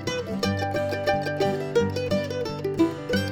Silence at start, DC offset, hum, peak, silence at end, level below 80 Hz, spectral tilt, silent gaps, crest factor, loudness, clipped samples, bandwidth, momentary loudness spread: 0 s; under 0.1%; none; -10 dBFS; 0 s; -52 dBFS; -6 dB/octave; none; 16 dB; -26 LUFS; under 0.1%; 20 kHz; 5 LU